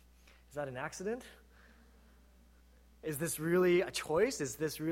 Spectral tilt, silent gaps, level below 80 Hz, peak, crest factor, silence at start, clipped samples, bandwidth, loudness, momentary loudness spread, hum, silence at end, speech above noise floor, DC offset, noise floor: -4.5 dB/octave; none; -62 dBFS; -18 dBFS; 18 dB; 0.5 s; under 0.1%; 16.5 kHz; -35 LUFS; 15 LU; none; 0 s; 28 dB; under 0.1%; -62 dBFS